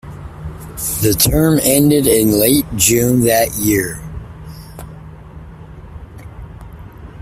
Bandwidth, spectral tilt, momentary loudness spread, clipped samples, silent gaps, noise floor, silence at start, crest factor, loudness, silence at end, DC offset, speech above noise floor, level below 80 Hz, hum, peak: 16 kHz; -4.5 dB/octave; 24 LU; under 0.1%; none; -34 dBFS; 0.05 s; 16 dB; -13 LUFS; 0 s; under 0.1%; 21 dB; -34 dBFS; none; 0 dBFS